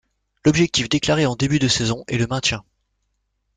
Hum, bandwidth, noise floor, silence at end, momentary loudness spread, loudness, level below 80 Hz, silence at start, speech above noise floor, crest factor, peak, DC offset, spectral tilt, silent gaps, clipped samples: 50 Hz at -40 dBFS; 9.6 kHz; -72 dBFS; 0.95 s; 5 LU; -19 LUFS; -46 dBFS; 0.45 s; 53 dB; 18 dB; -4 dBFS; under 0.1%; -4.5 dB/octave; none; under 0.1%